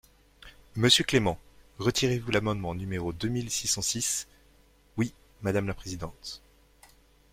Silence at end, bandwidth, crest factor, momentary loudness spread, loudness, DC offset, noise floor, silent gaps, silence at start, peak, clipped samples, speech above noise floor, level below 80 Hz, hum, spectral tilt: 0.95 s; 16.5 kHz; 24 dB; 19 LU; -28 LUFS; under 0.1%; -61 dBFS; none; 0.4 s; -6 dBFS; under 0.1%; 32 dB; -52 dBFS; none; -3.5 dB/octave